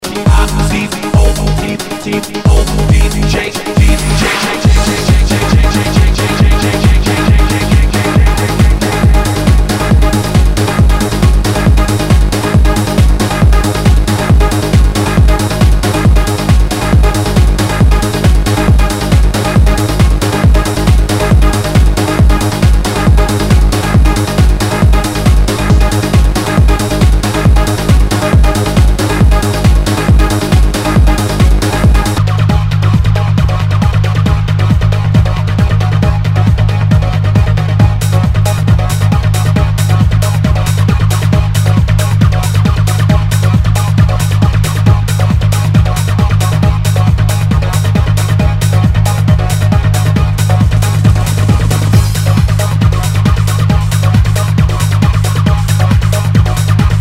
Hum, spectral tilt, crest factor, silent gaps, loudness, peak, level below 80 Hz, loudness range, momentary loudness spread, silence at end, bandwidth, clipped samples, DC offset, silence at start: none; -6 dB/octave; 8 dB; none; -10 LUFS; 0 dBFS; -12 dBFS; 1 LU; 1 LU; 0 s; 16 kHz; 1%; under 0.1%; 0 s